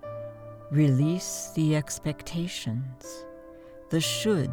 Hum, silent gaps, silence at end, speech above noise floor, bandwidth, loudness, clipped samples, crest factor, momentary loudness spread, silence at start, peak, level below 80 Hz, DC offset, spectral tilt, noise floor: none; none; 0 s; 20 dB; 19.5 kHz; -28 LUFS; under 0.1%; 16 dB; 21 LU; 0 s; -12 dBFS; -56 dBFS; under 0.1%; -5.5 dB/octave; -47 dBFS